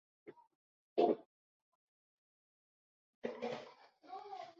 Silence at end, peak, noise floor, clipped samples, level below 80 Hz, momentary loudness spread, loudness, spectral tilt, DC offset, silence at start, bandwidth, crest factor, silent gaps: 0.1 s; -18 dBFS; -60 dBFS; under 0.1%; under -90 dBFS; 26 LU; -40 LUFS; -4 dB/octave; under 0.1%; 0.25 s; 7.4 kHz; 26 dB; 0.55-0.96 s, 1.26-3.22 s